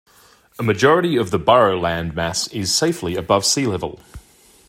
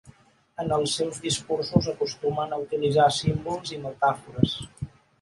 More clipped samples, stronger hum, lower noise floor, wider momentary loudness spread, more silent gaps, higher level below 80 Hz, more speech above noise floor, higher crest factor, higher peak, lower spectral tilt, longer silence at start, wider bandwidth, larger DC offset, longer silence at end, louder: neither; neither; about the same, -52 dBFS vs -55 dBFS; second, 9 LU vs 13 LU; neither; about the same, -48 dBFS vs -50 dBFS; first, 34 dB vs 29 dB; about the same, 18 dB vs 22 dB; about the same, -2 dBFS vs -4 dBFS; about the same, -4 dB/octave vs -5 dB/octave; first, 0.6 s vs 0.05 s; first, 16 kHz vs 11.5 kHz; neither; first, 0.5 s vs 0.35 s; first, -18 LUFS vs -26 LUFS